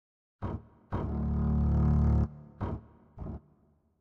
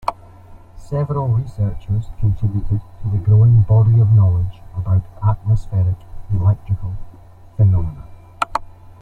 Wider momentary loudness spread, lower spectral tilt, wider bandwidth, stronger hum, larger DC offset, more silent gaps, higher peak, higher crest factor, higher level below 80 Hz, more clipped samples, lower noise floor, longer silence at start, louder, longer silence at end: about the same, 17 LU vs 15 LU; first, -11 dB/octave vs -9.5 dB/octave; second, 3.3 kHz vs 4.6 kHz; neither; neither; neither; second, -16 dBFS vs -2 dBFS; about the same, 16 dB vs 14 dB; about the same, -34 dBFS vs -32 dBFS; neither; first, -67 dBFS vs -40 dBFS; first, 0.4 s vs 0.05 s; second, -31 LUFS vs -18 LUFS; first, 0.65 s vs 0.1 s